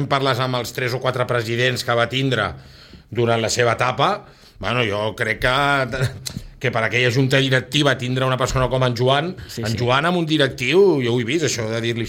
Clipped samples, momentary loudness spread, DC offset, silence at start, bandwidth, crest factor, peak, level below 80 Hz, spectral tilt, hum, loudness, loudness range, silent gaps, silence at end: under 0.1%; 8 LU; under 0.1%; 0 s; 16.5 kHz; 16 dB; -4 dBFS; -42 dBFS; -5 dB/octave; none; -19 LUFS; 2 LU; none; 0 s